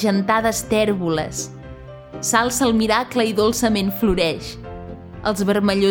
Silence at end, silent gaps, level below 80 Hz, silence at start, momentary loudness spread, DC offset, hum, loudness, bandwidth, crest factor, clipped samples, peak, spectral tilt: 0 s; none; -40 dBFS; 0 s; 17 LU; under 0.1%; none; -19 LUFS; over 20 kHz; 18 dB; under 0.1%; -2 dBFS; -4 dB/octave